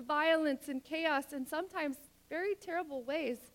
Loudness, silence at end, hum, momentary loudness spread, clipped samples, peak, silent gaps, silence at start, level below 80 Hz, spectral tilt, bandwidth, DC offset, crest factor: -36 LUFS; 0.05 s; none; 9 LU; under 0.1%; -20 dBFS; none; 0 s; -74 dBFS; -3 dB/octave; 17.5 kHz; under 0.1%; 16 dB